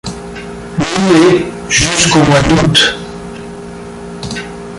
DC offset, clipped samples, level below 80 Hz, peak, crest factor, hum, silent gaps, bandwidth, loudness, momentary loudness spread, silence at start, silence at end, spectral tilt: under 0.1%; under 0.1%; -32 dBFS; 0 dBFS; 12 dB; none; none; 11.5 kHz; -10 LUFS; 19 LU; 0.05 s; 0 s; -4 dB/octave